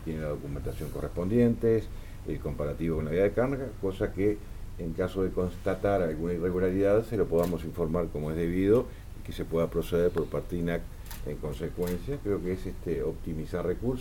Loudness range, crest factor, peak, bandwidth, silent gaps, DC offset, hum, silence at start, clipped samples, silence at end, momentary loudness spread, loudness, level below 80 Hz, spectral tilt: 4 LU; 18 dB; -12 dBFS; 17.5 kHz; none; under 0.1%; none; 0 s; under 0.1%; 0 s; 12 LU; -30 LUFS; -40 dBFS; -8 dB/octave